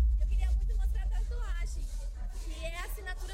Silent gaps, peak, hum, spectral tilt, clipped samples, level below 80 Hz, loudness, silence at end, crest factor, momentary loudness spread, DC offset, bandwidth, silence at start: none; -20 dBFS; none; -5 dB/octave; under 0.1%; -32 dBFS; -36 LUFS; 0 s; 12 dB; 10 LU; under 0.1%; 15.5 kHz; 0 s